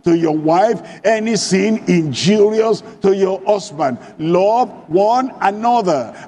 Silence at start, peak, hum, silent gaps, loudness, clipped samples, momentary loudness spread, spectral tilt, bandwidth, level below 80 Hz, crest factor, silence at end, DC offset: 0.05 s; 0 dBFS; none; none; -15 LUFS; under 0.1%; 5 LU; -5.5 dB/octave; 11 kHz; -58 dBFS; 16 dB; 0 s; under 0.1%